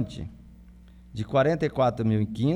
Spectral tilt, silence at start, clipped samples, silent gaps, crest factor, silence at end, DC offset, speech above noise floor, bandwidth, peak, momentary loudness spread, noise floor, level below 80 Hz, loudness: -8 dB/octave; 0 s; under 0.1%; none; 16 dB; 0 s; under 0.1%; 25 dB; 10 kHz; -10 dBFS; 17 LU; -49 dBFS; -50 dBFS; -25 LUFS